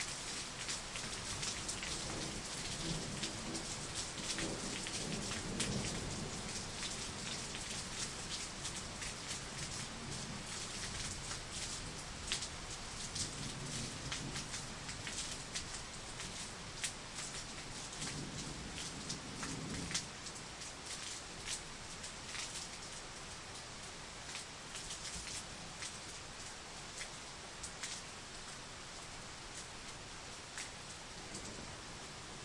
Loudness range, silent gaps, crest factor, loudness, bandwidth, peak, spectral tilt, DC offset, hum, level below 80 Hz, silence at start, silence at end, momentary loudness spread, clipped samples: 6 LU; none; 26 dB; -43 LUFS; 11.5 kHz; -20 dBFS; -2 dB/octave; under 0.1%; none; -58 dBFS; 0 s; 0 s; 8 LU; under 0.1%